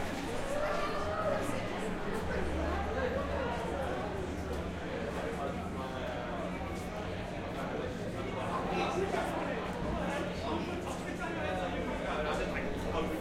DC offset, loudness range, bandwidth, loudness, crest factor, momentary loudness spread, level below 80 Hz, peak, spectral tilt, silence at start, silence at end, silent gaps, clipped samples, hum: under 0.1%; 3 LU; 16 kHz; -36 LUFS; 16 dB; 5 LU; -46 dBFS; -20 dBFS; -6 dB/octave; 0 s; 0 s; none; under 0.1%; none